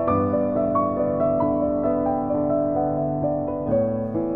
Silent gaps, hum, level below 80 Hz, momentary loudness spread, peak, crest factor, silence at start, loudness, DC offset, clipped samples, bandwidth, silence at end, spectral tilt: none; none; -46 dBFS; 3 LU; -10 dBFS; 12 dB; 0 s; -23 LUFS; 0.3%; under 0.1%; 3.6 kHz; 0 s; -13 dB/octave